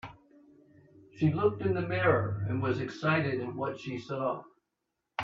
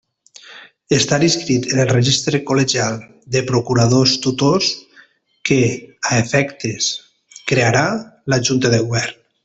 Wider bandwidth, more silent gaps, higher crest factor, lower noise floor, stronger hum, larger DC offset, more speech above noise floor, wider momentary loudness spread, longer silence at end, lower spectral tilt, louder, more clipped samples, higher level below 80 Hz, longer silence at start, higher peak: second, 7.4 kHz vs 8.2 kHz; neither; about the same, 20 dB vs 16 dB; first, -84 dBFS vs -50 dBFS; neither; neither; first, 54 dB vs 34 dB; first, 11 LU vs 8 LU; second, 0 s vs 0.3 s; first, -8 dB/octave vs -4.5 dB/octave; second, -31 LUFS vs -16 LUFS; neither; second, -64 dBFS vs -50 dBFS; second, 0.05 s vs 0.5 s; second, -10 dBFS vs -2 dBFS